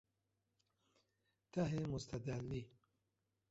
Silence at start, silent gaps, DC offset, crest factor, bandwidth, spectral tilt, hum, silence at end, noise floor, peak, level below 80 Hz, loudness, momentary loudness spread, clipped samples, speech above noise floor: 1.55 s; none; under 0.1%; 20 dB; 8 kHz; -7.5 dB/octave; none; 0.85 s; -87 dBFS; -28 dBFS; -66 dBFS; -44 LUFS; 8 LU; under 0.1%; 45 dB